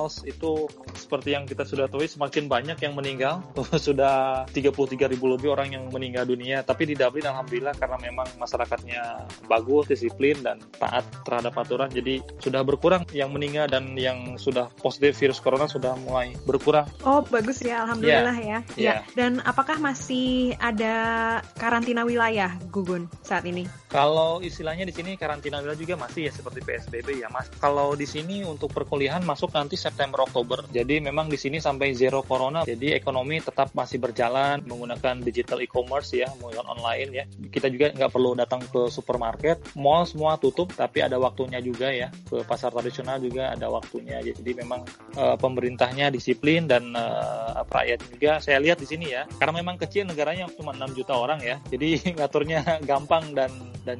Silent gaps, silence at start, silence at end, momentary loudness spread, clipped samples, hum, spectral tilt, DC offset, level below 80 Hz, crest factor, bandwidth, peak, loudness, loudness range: none; 0 s; 0 s; 10 LU; under 0.1%; none; -5.5 dB/octave; under 0.1%; -50 dBFS; 22 dB; 11.5 kHz; -4 dBFS; -26 LUFS; 4 LU